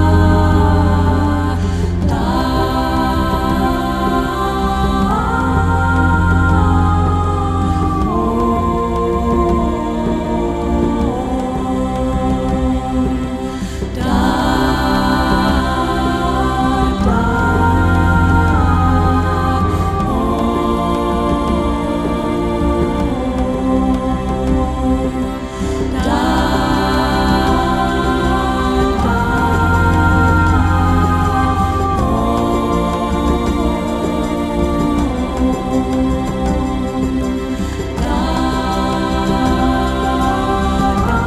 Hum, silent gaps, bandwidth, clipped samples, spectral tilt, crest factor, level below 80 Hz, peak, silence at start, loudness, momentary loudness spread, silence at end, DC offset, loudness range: none; none; 13.5 kHz; under 0.1%; -7 dB/octave; 14 dB; -22 dBFS; 0 dBFS; 0 s; -16 LUFS; 5 LU; 0 s; under 0.1%; 4 LU